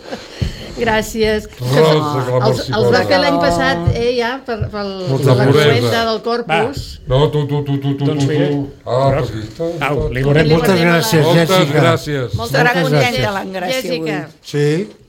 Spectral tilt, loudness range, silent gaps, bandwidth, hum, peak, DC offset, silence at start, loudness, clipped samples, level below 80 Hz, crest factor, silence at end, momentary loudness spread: -6 dB/octave; 4 LU; none; 17 kHz; none; 0 dBFS; under 0.1%; 0.05 s; -15 LUFS; under 0.1%; -36 dBFS; 14 dB; 0.15 s; 10 LU